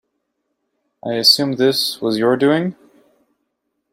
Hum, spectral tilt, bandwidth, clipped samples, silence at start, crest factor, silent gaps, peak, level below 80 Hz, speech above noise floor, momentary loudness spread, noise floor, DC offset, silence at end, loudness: none; -4 dB/octave; 16.5 kHz; under 0.1%; 1.05 s; 20 dB; none; 0 dBFS; -64 dBFS; 57 dB; 13 LU; -73 dBFS; under 0.1%; 1.2 s; -16 LUFS